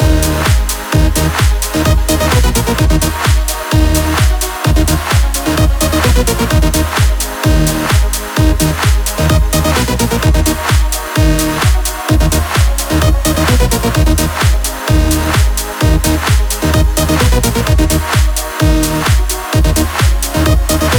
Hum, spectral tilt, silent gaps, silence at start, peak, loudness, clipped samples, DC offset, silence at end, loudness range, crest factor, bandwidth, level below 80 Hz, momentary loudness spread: none; -4.5 dB/octave; none; 0 s; 0 dBFS; -12 LUFS; under 0.1%; under 0.1%; 0 s; 0 LU; 10 dB; over 20 kHz; -14 dBFS; 2 LU